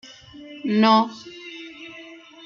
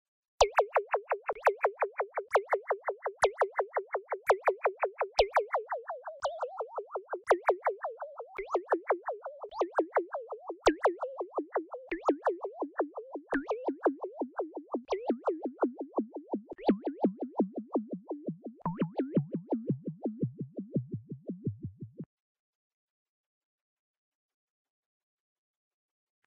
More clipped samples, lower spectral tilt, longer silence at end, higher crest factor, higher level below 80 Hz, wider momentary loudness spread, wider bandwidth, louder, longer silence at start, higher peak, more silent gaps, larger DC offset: neither; about the same, -5.5 dB/octave vs -5.5 dB/octave; second, 0.3 s vs 4.2 s; second, 18 dB vs 24 dB; second, -70 dBFS vs -60 dBFS; first, 26 LU vs 12 LU; second, 7.2 kHz vs 13 kHz; first, -20 LUFS vs -33 LUFS; about the same, 0.4 s vs 0.4 s; first, -6 dBFS vs -10 dBFS; neither; neither